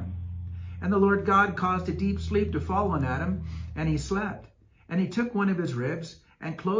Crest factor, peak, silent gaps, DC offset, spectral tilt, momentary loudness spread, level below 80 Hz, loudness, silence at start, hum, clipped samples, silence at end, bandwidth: 18 dB; -10 dBFS; none; under 0.1%; -7.5 dB/octave; 15 LU; -40 dBFS; -28 LUFS; 0 s; none; under 0.1%; 0 s; 7.6 kHz